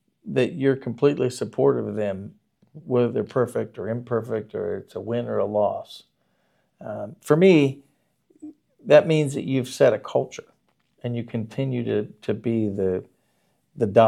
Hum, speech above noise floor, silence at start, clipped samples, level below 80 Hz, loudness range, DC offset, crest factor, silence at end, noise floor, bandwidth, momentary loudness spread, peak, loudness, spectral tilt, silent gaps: none; 46 dB; 0.25 s; under 0.1%; -72 dBFS; 7 LU; under 0.1%; 22 dB; 0 s; -69 dBFS; 13.5 kHz; 17 LU; -2 dBFS; -23 LUFS; -7 dB/octave; none